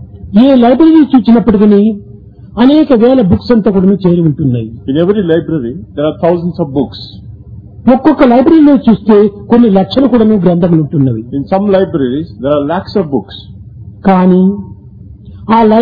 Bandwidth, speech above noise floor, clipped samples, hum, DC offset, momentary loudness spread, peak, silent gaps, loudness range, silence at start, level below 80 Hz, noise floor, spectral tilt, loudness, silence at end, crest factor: 5 kHz; 24 dB; 1%; none; under 0.1%; 11 LU; 0 dBFS; none; 6 LU; 0 s; -36 dBFS; -32 dBFS; -10.5 dB/octave; -9 LUFS; 0 s; 8 dB